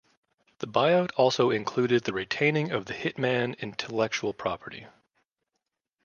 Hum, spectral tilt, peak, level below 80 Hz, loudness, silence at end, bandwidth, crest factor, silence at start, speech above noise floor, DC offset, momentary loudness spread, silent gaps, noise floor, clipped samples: none; -5.5 dB/octave; -8 dBFS; -66 dBFS; -27 LUFS; 1.15 s; 7.2 kHz; 20 dB; 0.6 s; 57 dB; under 0.1%; 11 LU; none; -84 dBFS; under 0.1%